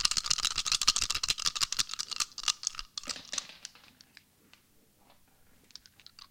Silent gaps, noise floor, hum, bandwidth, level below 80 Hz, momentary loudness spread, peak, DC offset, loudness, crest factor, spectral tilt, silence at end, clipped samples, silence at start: none; -65 dBFS; none; 17 kHz; -58 dBFS; 22 LU; -6 dBFS; under 0.1%; -30 LUFS; 30 dB; 2 dB/octave; 0.05 s; under 0.1%; 0 s